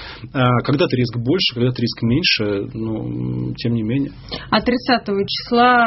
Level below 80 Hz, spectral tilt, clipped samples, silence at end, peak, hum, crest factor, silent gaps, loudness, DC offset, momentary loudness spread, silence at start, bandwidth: -44 dBFS; -4 dB/octave; under 0.1%; 0 s; 0 dBFS; none; 18 dB; none; -19 LUFS; under 0.1%; 9 LU; 0 s; 6 kHz